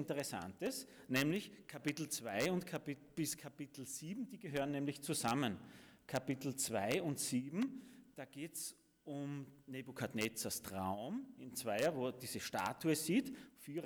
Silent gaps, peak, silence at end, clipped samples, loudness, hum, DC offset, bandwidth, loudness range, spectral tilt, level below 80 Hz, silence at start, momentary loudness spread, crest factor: none; -24 dBFS; 0 s; under 0.1%; -41 LUFS; none; under 0.1%; over 20 kHz; 4 LU; -4 dB/octave; -76 dBFS; 0 s; 13 LU; 18 dB